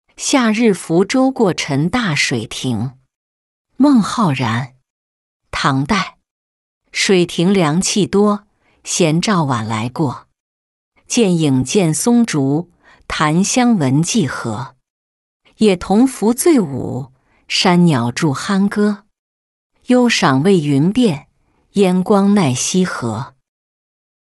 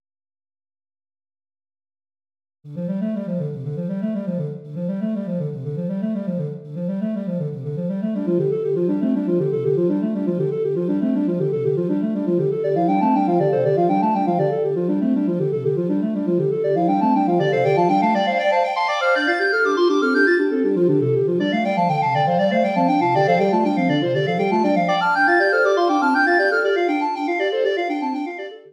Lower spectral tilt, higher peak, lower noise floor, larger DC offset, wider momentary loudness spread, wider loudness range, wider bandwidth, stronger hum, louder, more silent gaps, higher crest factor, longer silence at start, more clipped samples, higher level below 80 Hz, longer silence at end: second, -5 dB/octave vs -7.5 dB/octave; first, -2 dBFS vs -6 dBFS; second, -58 dBFS vs under -90 dBFS; neither; about the same, 11 LU vs 9 LU; second, 3 LU vs 8 LU; first, 12 kHz vs 10.5 kHz; neither; first, -15 LUFS vs -20 LUFS; first, 3.16-3.65 s, 4.90-5.40 s, 6.31-6.81 s, 10.40-10.92 s, 14.90-15.40 s, 19.19-19.70 s vs none; about the same, 14 dB vs 14 dB; second, 0.2 s vs 2.65 s; neither; first, -48 dBFS vs -72 dBFS; first, 1.1 s vs 0.15 s